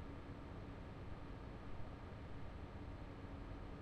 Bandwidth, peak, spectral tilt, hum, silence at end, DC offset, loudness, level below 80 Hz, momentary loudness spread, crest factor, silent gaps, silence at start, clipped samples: 11 kHz; -36 dBFS; -7.5 dB/octave; none; 0 s; under 0.1%; -53 LUFS; -56 dBFS; 1 LU; 14 dB; none; 0 s; under 0.1%